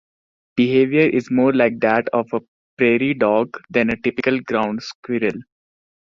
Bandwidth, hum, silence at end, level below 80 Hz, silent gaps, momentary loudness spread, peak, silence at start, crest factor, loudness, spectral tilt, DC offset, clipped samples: 7.2 kHz; none; 0.7 s; -58 dBFS; 2.48-2.77 s, 4.95-5.03 s; 10 LU; -2 dBFS; 0.55 s; 16 dB; -19 LUFS; -7 dB/octave; under 0.1%; under 0.1%